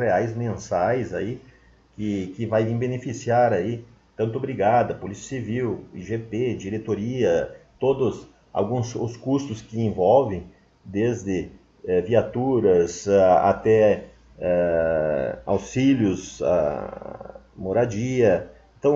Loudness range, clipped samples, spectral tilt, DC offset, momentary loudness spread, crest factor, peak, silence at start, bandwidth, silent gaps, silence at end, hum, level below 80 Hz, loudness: 5 LU; under 0.1%; -7 dB/octave; under 0.1%; 13 LU; 18 dB; -4 dBFS; 0 s; 7.8 kHz; none; 0 s; none; -52 dBFS; -23 LUFS